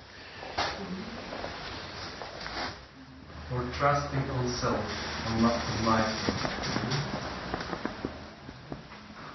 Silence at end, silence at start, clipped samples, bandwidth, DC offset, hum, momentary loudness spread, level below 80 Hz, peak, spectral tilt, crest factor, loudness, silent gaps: 0 s; 0 s; under 0.1%; 6.2 kHz; under 0.1%; none; 17 LU; -48 dBFS; -10 dBFS; -5 dB/octave; 22 dB; -32 LUFS; none